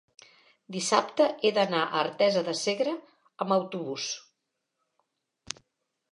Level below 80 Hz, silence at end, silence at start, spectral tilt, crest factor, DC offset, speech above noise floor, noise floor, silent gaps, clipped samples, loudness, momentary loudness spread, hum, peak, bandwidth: -78 dBFS; 1.9 s; 0.7 s; -3.5 dB/octave; 24 dB; under 0.1%; 55 dB; -82 dBFS; none; under 0.1%; -27 LUFS; 15 LU; none; -6 dBFS; 11.5 kHz